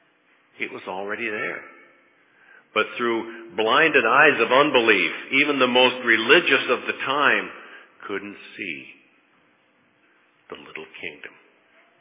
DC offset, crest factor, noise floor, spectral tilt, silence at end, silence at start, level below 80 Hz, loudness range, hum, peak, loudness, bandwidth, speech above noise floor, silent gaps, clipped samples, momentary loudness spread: under 0.1%; 22 dB; -62 dBFS; -7 dB/octave; 0.7 s; 0.6 s; -78 dBFS; 20 LU; none; 0 dBFS; -19 LUFS; 3.9 kHz; 41 dB; none; under 0.1%; 20 LU